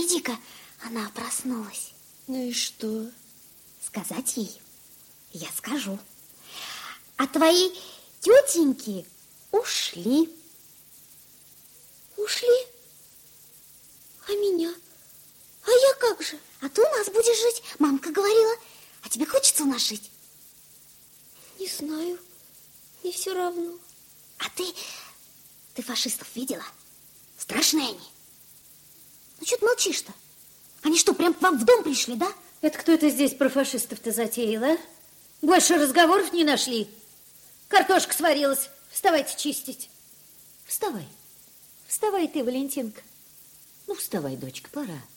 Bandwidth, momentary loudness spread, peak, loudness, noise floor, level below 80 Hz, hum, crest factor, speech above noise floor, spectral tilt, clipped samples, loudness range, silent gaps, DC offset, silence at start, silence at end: 17 kHz; 19 LU; -2 dBFS; -24 LUFS; -53 dBFS; -70 dBFS; none; 24 dB; 29 dB; -2 dB/octave; under 0.1%; 11 LU; none; under 0.1%; 0 s; 0.1 s